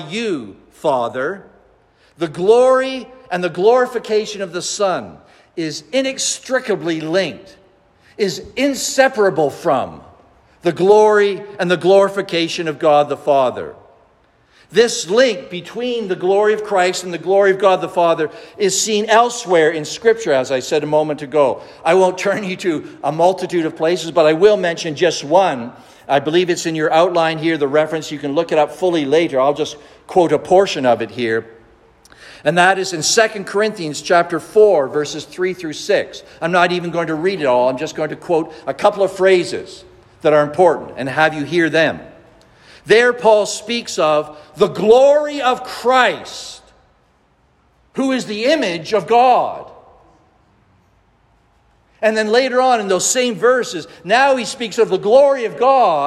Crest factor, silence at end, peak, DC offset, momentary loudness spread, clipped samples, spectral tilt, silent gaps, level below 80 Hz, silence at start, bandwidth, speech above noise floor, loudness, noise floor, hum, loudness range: 16 dB; 0 s; 0 dBFS; under 0.1%; 11 LU; under 0.1%; -3.5 dB/octave; none; -58 dBFS; 0 s; 13.5 kHz; 41 dB; -16 LUFS; -57 dBFS; none; 4 LU